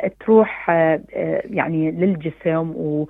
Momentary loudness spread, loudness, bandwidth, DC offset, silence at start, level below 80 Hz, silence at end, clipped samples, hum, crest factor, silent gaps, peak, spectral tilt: 8 LU; -19 LUFS; 3.9 kHz; under 0.1%; 0 s; -56 dBFS; 0 s; under 0.1%; none; 18 dB; none; -2 dBFS; -10.5 dB/octave